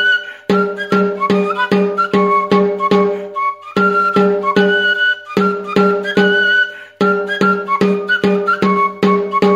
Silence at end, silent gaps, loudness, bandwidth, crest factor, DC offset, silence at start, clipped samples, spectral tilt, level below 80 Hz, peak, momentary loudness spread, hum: 0 s; none; -14 LUFS; 10 kHz; 14 dB; under 0.1%; 0 s; under 0.1%; -6.5 dB/octave; -58 dBFS; 0 dBFS; 4 LU; none